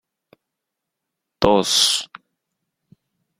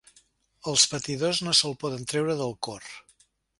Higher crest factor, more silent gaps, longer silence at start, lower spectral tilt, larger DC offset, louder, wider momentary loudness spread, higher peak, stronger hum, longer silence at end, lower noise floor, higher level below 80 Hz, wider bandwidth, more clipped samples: about the same, 24 dB vs 24 dB; neither; first, 1.4 s vs 0.65 s; about the same, -2.5 dB/octave vs -2.5 dB/octave; neither; first, -17 LUFS vs -25 LUFS; second, 10 LU vs 18 LU; first, 0 dBFS vs -4 dBFS; neither; first, 1.35 s vs 0.6 s; first, -82 dBFS vs -65 dBFS; first, -48 dBFS vs -64 dBFS; first, 16.5 kHz vs 11.5 kHz; neither